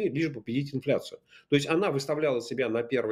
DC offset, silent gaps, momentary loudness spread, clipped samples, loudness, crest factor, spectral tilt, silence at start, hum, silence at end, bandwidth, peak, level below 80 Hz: under 0.1%; none; 5 LU; under 0.1%; -29 LUFS; 18 dB; -6 dB/octave; 0 s; none; 0 s; 14.5 kHz; -10 dBFS; -70 dBFS